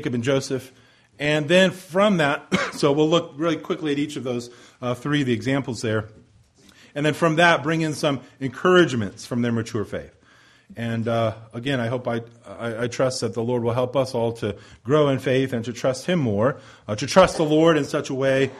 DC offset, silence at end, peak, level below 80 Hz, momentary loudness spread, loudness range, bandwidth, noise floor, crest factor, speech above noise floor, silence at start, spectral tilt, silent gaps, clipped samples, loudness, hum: under 0.1%; 0 s; -2 dBFS; -56 dBFS; 13 LU; 6 LU; 13.5 kHz; -54 dBFS; 20 dB; 32 dB; 0 s; -5.5 dB/octave; none; under 0.1%; -22 LUFS; none